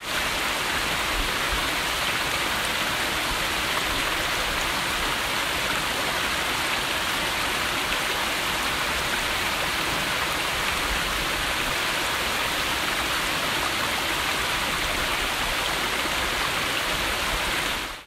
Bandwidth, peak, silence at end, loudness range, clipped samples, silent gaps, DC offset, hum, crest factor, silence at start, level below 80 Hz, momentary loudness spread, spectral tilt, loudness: 16 kHz; -10 dBFS; 0 s; 0 LU; under 0.1%; none; under 0.1%; none; 16 dB; 0 s; -40 dBFS; 0 LU; -1.5 dB/octave; -24 LUFS